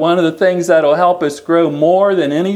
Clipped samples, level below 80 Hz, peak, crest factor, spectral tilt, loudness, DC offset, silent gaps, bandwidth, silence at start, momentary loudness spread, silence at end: under 0.1%; -64 dBFS; 0 dBFS; 12 dB; -6 dB/octave; -13 LUFS; under 0.1%; none; 14.5 kHz; 0 s; 3 LU; 0 s